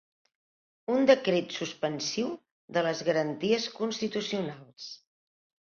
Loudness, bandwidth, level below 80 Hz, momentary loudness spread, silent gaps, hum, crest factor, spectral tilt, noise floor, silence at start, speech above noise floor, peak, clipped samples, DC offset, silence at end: -29 LUFS; 7.2 kHz; -74 dBFS; 20 LU; 2.51-2.68 s; none; 22 dB; -4.5 dB/octave; under -90 dBFS; 0.9 s; over 61 dB; -8 dBFS; under 0.1%; under 0.1%; 0.8 s